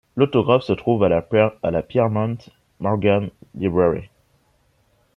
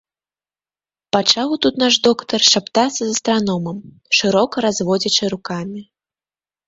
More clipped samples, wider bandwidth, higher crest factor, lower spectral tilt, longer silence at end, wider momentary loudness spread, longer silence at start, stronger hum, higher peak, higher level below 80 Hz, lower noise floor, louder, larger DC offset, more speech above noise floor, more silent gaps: neither; second, 6.4 kHz vs 8 kHz; about the same, 18 dB vs 18 dB; first, -9 dB/octave vs -3 dB/octave; first, 1.1 s vs 0.85 s; second, 9 LU vs 13 LU; second, 0.15 s vs 1.15 s; neither; about the same, -2 dBFS vs 0 dBFS; first, -52 dBFS vs -58 dBFS; second, -62 dBFS vs under -90 dBFS; second, -20 LUFS vs -16 LUFS; neither; second, 43 dB vs over 73 dB; neither